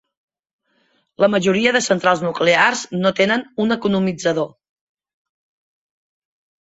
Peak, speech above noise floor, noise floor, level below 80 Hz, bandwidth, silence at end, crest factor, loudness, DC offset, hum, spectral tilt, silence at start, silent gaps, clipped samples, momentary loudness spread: -2 dBFS; 46 dB; -63 dBFS; -60 dBFS; 8 kHz; 2.2 s; 18 dB; -17 LUFS; under 0.1%; none; -4.5 dB/octave; 1.2 s; none; under 0.1%; 6 LU